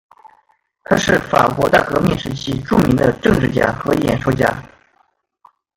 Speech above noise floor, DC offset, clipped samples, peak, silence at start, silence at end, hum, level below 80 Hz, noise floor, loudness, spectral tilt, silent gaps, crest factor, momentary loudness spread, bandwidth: 45 dB; under 0.1%; under 0.1%; 0 dBFS; 0.9 s; 1.1 s; none; -38 dBFS; -61 dBFS; -16 LUFS; -6 dB/octave; none; 16 dB; 5 LU; 17 kHz